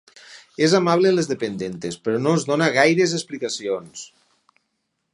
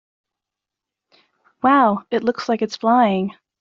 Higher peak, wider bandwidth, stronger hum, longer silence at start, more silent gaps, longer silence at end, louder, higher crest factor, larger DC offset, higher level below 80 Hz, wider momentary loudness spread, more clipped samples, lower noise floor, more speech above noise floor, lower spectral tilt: about the same, -2 dBFS vs -2 dBFS; first, 11.5 kHz vs 7.6 kHz; neither; second, 0.3 s vs 1.65 s; neither; first, 1.1 s vs 0.3 s; about the same, -20 LUFS vs -18 LUFS; about the same, 20 dB vs 18 dB; neither; about the same, -66 dBFS vs -66 dBFS; first, 14 LU vs 8 LU; neither; second, -75 dBFS vs -85 dBFS; second, 54 dB vs 68 dB; about the same, -4.5 dB/octave vs -4.5 dB/octave